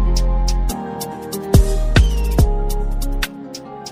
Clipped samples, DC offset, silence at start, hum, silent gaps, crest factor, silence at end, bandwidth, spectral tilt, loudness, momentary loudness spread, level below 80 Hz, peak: under 0.1%; under 0.1%; 0 s; none; none; 16 dB; 0 s; 15.5 kHz; -5.5 dB/octave; -19 LUFS; 11 LU; -18 dBFS; 0 dBFS